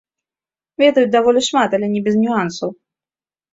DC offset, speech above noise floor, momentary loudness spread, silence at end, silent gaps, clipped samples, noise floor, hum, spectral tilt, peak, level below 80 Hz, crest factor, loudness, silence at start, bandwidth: under 0.1%; over 75 dB; 12 LU; 0.8 s; none; under 0.1%; under -90 dBFS; none; -4.5 dB/octave; -2 dBFS; -62 dBFS; 16 dB; -16 LUFS; 0.8 s; 8 kHz